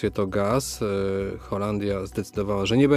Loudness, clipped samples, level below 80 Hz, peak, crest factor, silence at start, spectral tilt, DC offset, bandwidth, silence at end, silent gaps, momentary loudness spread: -26 LUFS; under 0.1%; -46 dBFS; -8 dBFS; 16 dB; 0 s; -6 dB/octave; under 0.1%; 16 kHz; 0 s; none; 6 LU